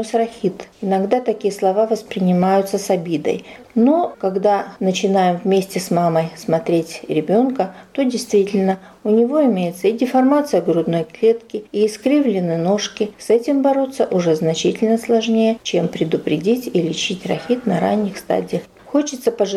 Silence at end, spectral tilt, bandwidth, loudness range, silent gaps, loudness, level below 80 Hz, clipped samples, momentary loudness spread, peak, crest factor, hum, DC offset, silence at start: 0 s; -6 dB/octave; 15 kHz; 2 LU; none; -18 LUFS; -60 dBFS; under 0.1%; 6 LU; -4 dBFS; 12 dB; none; under 0.1%; 0 s